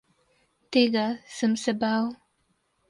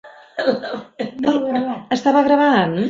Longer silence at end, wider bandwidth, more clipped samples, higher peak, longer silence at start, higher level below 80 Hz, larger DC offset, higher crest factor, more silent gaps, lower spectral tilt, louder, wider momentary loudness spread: first, 0.75 s vs 0 s; first, 11.5 kHz vs 7.6 kHz; neither; second, -8 dBFS vs -2 dBFS; first, 0.7 s vs 0.05 s; second, -70 dBFS vs -60 dBFS; neither; about the same, 18 dB vs 16 dB; neither; second, -4.5 dB/octave vs -6 dB/octave; second, -26 LUFS vs -18 LUFS; second, 7 LU vs 14 LU